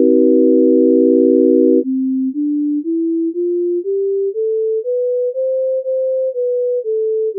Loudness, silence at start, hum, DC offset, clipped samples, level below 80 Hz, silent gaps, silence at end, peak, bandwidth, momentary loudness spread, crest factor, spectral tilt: -15 LUFS; 0 s; none; under 0.1%; under 0.1%; under -90 dBFS; none; 0 s; -2 dBFS; 0.6 kHz; 7 LU; 12 dB; -7.5 dB/octave